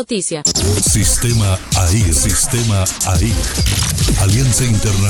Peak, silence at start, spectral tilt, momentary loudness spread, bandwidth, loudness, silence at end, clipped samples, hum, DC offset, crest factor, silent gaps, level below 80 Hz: -2 dBFS; 0 s; -4 dB/octave; 3 LU; over 20 kHz; -14 LUFS; 0 s; under 0.1%; none; under 0.1%; 12 dB; none; -22 dBFS